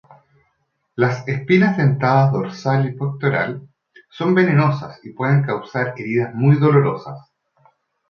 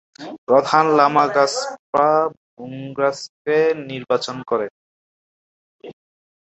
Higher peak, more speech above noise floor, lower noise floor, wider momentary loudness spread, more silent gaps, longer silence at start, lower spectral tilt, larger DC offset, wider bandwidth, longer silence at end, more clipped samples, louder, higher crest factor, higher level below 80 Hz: about the same, -2 dBFS vs -2 dBFS; second, 52 dB vs over 72 dB; second, -69 dBFS vs under -90 dBFS; second, 13 LU vs 17 LU; second, none vs 0.38-0.47 s, 1.79-1.93 s, 2.37-2.57 s, 3.29-3.45 s, 4.71-5.79 s; first, 0.95 s vs 0.2 s; first, -8.5 dB/octave vs -4.5 dB/octave; neither; second, 6.8 kHz vs 8.4 kHz; first, 0.9 s vs 0.65 s; neither; about the same, -18 LUFS vs -18 LUFS; about the same, 16 dB vs 18 dB; first, -60 dBFS vs -66 dBFS